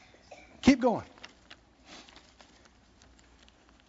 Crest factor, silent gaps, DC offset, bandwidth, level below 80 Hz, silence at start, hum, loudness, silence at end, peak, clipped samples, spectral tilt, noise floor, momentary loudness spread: 24 dB; none; under 0.1%; 7.6 kHz; -56 dBFS; 0.65 s; none; -27 LUFS; 1.9 s; -8 dBFS; under 0.1%; -4.5 dB/octave; -60 dBFS; 28 LU